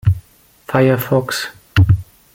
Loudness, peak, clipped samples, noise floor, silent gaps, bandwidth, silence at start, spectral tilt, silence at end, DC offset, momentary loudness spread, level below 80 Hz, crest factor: -17 LUFS; 0 dBFS; under 0.1%; -47 dBFS; none; 17 kHz; 0.05 s; -6.5 dB/octave; 0.3 s; under 0.1%; 8 LU; -36 dBFS; 16 dB